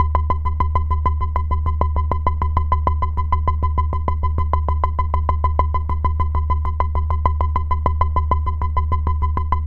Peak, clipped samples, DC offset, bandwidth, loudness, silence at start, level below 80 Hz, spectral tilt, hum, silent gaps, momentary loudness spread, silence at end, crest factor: 0 dBFS; under 0.1%; under 0.1%; 3.2 kHz; -21 LUFS; 0 s; -20 dBFS; -9.5 dB/octave; none; none; 2 LU; 0 s; 18 dB